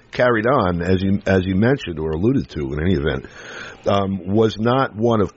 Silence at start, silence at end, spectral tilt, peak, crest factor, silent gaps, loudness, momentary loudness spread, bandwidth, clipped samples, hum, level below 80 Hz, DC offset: 0.15 s; 0.05 s; -7.5 dB/octave; -4 dBFS; 16 dB; none; -19 LUFS; 9 LU; 7.8 kHz; under 0.1%; none; -40 dBFS; under 0.1%